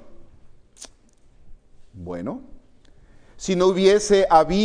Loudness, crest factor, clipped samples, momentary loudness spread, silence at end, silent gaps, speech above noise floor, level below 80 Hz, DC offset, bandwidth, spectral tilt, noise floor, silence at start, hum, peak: -19 LUFS; 20 dB; under 0.1%; 27 LU; 0 s; none; 34 dB; -44 dBFS; under 0.1%; 10.5 kHz; -5 dB/octave; -53 dBFS; 0.05 s; none; -2 dBFS